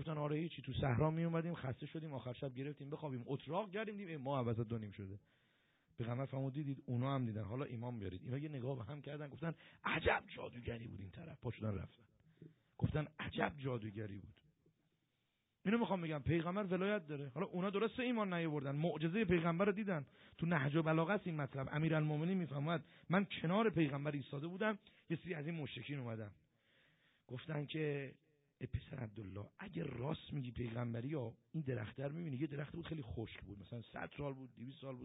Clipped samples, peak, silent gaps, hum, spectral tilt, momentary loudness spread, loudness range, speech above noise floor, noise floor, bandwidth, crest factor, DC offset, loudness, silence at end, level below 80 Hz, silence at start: under 0.1%; -20 dBFS; none; none; -5 dB/octave; 13 LU; 8 LU; 44 dB; -85 dBFS; 3.9 kHz; 22 dB; under 0.1%; -42 LUFS; 0 s; -66 dBFS; 0 s